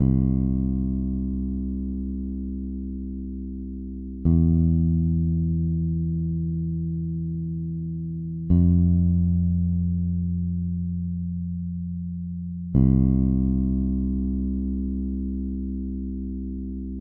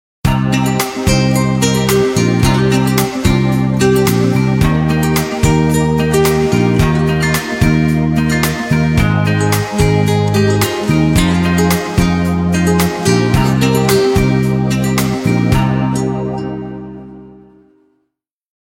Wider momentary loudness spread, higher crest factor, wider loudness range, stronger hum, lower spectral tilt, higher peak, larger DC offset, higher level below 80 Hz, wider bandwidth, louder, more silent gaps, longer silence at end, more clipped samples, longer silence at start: first, 12 LU vs 3 LU; about the same, 16 dB vs 12 dB; about the same, 5 LU vs 3 LU; neither; first, -16 dB/octave vs -6 dB/octave; second, -6 dBFS vs 0 dBFS; neither; about the same, -32 dBFS vs -28 dBFS; second, 1.3 kHz vs 17 kHz; second, -25 LUFS vs -13 LUFS; neither; second, 0 s vs 1.3 s; neither; second, 0 s vs 0.25 s